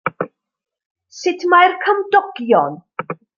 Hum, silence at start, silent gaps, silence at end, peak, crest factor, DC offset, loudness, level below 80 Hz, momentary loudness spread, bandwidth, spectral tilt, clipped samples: none; 0.05 s; 0.86-0.95 s; 0.25 s; -2 dBFS; 16 dB; under 0.1%; -16 LUFS; -66 dBFS; 17 LU; 7.2 kHz; -4.5 dB/octave; under 0.1%